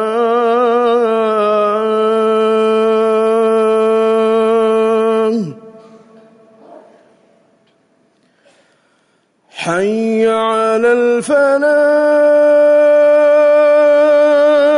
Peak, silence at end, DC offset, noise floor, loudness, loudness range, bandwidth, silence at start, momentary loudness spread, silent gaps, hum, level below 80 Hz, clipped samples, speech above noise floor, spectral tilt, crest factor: -4 dBFS; 0 s; under 0.1%; -58 dBFS; -12 LUFS; 11 LU; 11 kHz; 0 s; 5 LU; none; none; -66 dBFS; under 0.1%; 46 dB; -5.5 dB/octave; 8 dB